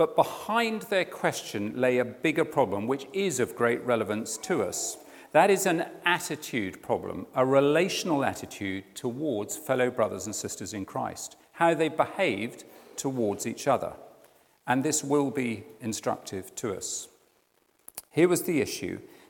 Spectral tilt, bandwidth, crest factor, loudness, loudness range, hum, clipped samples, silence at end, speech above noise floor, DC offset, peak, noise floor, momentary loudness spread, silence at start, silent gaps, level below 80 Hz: -4 dB/octave; 18 kHz; 22 dB; -28 LUFS; 4 LU; none; under 0.1%; 0.25 s; 40 dB; under 0.1%; -6 dBFS; -68 dBFS; 11 LU; 0 s; none; -70 dBFS